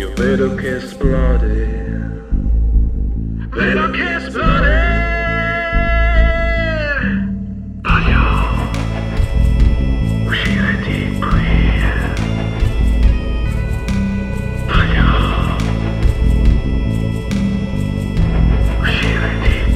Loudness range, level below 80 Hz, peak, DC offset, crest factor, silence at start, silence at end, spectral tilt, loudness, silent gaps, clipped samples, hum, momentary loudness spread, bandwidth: 2 LU; -16 dBFS; 0 dBFS; under 0.1%; 14 dB; 0 s; 0 s; -7 dB/octave; -17 LUFS; none; under 0.1%; none; 6 LU; 9.4 kHz